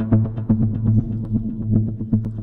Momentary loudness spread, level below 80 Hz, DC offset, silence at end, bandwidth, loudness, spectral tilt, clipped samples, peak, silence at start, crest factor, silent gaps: 5 LU; -34 dBFS; under 0.1%; 0 s; 2.1 kHz; -21 LUFS; -13 dB/octave; under 0.1%; -4 dBFS; 0 s; 16 dB; none